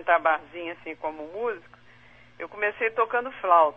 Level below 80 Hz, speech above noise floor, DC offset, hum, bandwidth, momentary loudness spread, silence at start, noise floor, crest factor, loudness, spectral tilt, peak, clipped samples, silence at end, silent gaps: -64 dBFS; 28 dB; 0.1%; none; 5 kHz; 15 LU; 0 s; -54 dBFS; 20 dB; -27 LUFS; -6 dB/octave; -6 dBFS; under 0.1%; 0.05 s; none